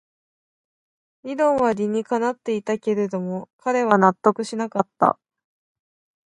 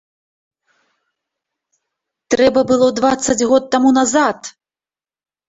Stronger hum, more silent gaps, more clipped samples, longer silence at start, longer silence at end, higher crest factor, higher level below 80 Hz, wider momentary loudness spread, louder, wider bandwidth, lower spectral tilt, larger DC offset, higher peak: neither; first, 3.53-3.59 s vs none; neither; second, 1.25 s vs 2.3 s; first, 1.15 s vs 1 s; first, 22 dB vs 16 dB; second, -66 dBFS vs -52 dBFS; first, 11 LU vs 7 LU; second, -22 LUFS vs -14 LUFS; first, 11 kHz vs 8.2 kHz; first, -6.5 dB/octave vs -3.5 dB/octave; neither; about the same, -2 dBFS vs -2 dBFS